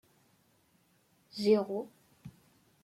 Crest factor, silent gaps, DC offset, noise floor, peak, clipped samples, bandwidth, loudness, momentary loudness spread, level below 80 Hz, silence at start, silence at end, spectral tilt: 22 dB; none; under 0.1%; -70 dBFS; -16 dBFS; under 0.1%; 14.5 kHz; -31 LUFS; 26 LU; -78 dBFS; 1.35 s; 0.55 s; -6.5 dB/octave